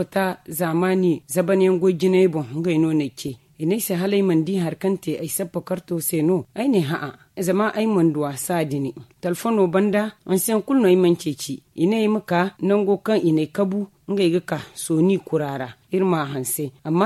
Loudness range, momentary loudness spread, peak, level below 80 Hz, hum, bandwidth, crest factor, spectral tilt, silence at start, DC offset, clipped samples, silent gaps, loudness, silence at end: 3 LU; 9 LU; -6 dBFS; -64 dBFS; none; 14 kHz; 16 dB; -6 dB/octave; 0 s; under 0.1%; under 0.1%; none; -21 LUFS; 0 s